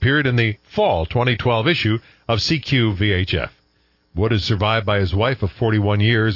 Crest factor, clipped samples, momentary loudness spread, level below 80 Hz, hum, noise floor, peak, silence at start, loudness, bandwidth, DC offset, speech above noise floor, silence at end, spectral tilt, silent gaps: 14 dB; under 0.1%; 6 LU; -42 dBFS; none; -61 dBFS; -4 dBFS; 0 s; -19 LUFS; 6 kHz; under 0.1%; 43 dB; 0 s; -6.5 dB/octave; none